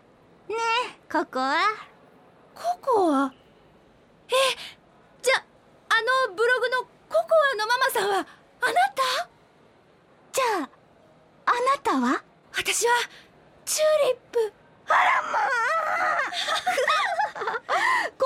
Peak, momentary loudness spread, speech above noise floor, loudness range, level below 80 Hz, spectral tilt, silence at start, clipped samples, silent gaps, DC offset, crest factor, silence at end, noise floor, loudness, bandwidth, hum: -10 dBFS; 9 LU; 33 dB; 4 LU; -70 dBFS; -1 dB/octave; 0.5 s; under 0.1%; none; under 0.1%; 16 dB; 0 s; -57 dBFS; -24 LUFS; 16.5 kHz; none